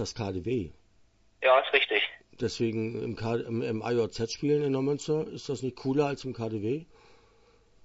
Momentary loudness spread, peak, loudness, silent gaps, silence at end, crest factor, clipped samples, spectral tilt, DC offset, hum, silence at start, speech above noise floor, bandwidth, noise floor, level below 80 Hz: 11 LU; -6 dBFS; -29 LUFS; none; 1 s; 24 dB; under 0.1%; -5.5 dB/octave; under 0.1%; none; 0 s; 35 dB; 8 kHz; -64 dBFS; -58 dBFS